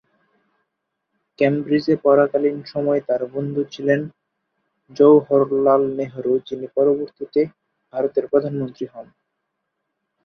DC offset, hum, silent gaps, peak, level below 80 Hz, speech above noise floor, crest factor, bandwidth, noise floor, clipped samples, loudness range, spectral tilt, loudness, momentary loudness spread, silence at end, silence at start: under 0.1%; none; none; -2 dBFS; -66 dBFS; 59 dB; 18 dB; 6.4 kHz; -77 dBFS; under 0.1%; 5 LU; -8.5 dB/octave; -19 LUFS; 11 LU; 1.2 s; 1.4 s